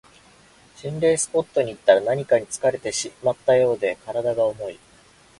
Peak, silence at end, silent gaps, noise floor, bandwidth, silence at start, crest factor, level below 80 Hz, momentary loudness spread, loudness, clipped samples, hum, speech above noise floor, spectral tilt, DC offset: -2 dBFS; 0.65 s; none; -53 dBFS; 11.5 kHz; 0.8 s; 20 dB; -60 dBFS; 8 LU; -22 LUFS; under 0.1%; none; 32 dB; -4 dB/octave; under 0.1%